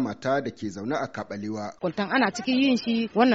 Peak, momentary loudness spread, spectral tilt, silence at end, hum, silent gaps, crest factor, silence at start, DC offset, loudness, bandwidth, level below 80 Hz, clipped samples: -8 dBFS; 11 LU; -3.5 dB/octave; 0 s; none; none; 16 dB; 0 s; under 0.1%; -26 LUFS; 8 kHz; -66 dBFS; under 0.1%